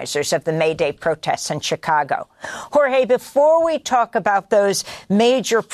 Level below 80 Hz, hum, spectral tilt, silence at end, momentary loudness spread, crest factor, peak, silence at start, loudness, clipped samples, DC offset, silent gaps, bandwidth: -58 dBFS; none; -4 dB/octave; 0 s; 7 LU; 14 dB; -4 dBFS; 0 s; -18 LUFS; under 0.1%; under 0.1%; none; 13.5 kHz